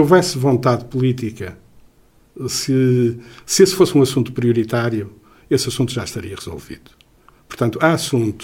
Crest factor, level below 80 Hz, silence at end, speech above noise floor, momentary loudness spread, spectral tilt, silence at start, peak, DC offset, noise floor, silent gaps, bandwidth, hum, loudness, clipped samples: 18 dB; -50 dBFS; 0 s; 35 dB; 18 LU; -5.5 dB/octave; 0 s; 0 dBFS; under 0.1%; -52 dBFS; none; 17 kHz; none; -17 LUFS; under 0.1%